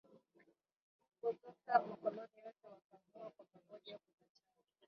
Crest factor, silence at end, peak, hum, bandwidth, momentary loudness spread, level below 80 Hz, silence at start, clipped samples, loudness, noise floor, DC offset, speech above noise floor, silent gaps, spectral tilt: 26 dB; 0.9 s; -20 dBFS; none; 5.8 kHz; 23 LU; under -90 dBFS; 0.15 s; under 0.1%; -41 LUFS; -78 dBFS; under 0.1%; 38 dB; 0.76-0.99 s, 2.84-2.90 s; -3 dB/octave